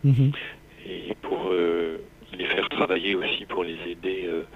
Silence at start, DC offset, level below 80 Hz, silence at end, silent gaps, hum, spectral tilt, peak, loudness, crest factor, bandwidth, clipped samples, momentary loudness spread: 0 s; under 0.1%; -54 dBFS; 0 s; none; 50 Hz at -55 dBFS; -8 dB/octave; -8 dBFS; -26 LUFS; 18 dB; 5.2 kHz; under 0.1%; 15 LU